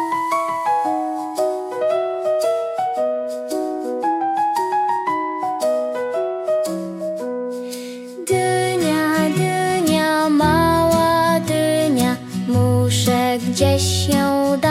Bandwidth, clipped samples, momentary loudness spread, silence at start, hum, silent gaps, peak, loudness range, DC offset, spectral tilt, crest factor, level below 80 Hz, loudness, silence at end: 16 kHz; under 0.1%; 9 LU; 0 s; none; none; -4 dBFS; 5 LU; under 0.1%; -5 dB/octave; 14 dB; -50 dBFS; -19 LUFS; 0 s